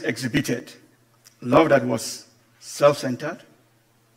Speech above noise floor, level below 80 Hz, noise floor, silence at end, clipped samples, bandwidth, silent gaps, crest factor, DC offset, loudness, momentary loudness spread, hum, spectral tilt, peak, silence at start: 39 dB; -56 dBFS; -61 dBFS; 0.8 s; under 0.1%; 16 kHz; none; 22 dB; under 0.1%; -22 LUFS; 19 LU; none; -5 dB/octave; -2 dBFS; 0 s